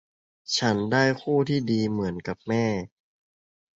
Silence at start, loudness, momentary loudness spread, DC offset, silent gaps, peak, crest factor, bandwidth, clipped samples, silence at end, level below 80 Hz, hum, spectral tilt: 0.5 s; -25 LUFS; 11 LU; under 0.1%; none; -6 dBFS; 20 dB; 8 kHz; under 0.1%; 0.95 s; -58 dBFS; none; -5.5 dB/octave